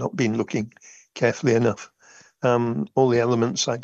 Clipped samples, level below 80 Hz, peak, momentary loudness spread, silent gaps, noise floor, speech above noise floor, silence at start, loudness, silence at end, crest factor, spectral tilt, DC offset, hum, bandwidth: under 0.1%; -66 dBFS; -6 dBFS; 15 LU; none; -53 dBFS; 31 dB; 0 s; -22 LUFS; 0 s; 18 dB; -5.5 dB/octave; under 0.1%; none; 8.2 kHz